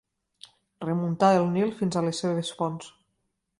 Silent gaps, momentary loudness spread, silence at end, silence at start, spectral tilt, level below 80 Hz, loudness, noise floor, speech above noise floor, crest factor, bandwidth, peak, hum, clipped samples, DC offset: none; 14 LU; 0.7 s; 0.8 s; -6 dB/octave; -66 dBFS; -26 LUFS; -77 dBFS; 52 dB; 20 dB; 11.5 kHz; -8 dBFS; none; under 0.1%; under 0.1%